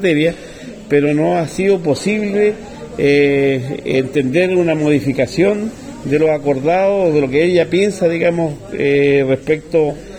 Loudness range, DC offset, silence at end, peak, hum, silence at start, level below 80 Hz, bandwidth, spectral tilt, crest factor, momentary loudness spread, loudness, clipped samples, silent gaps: 1 LU; under 0.1%; 0 s; -2 dBFS; none; 0 s; -44 dBFS; 12 kHz; -6.5 dB/octave; 14 dB; 7 LU; -15 LUFS; under 0.1%; none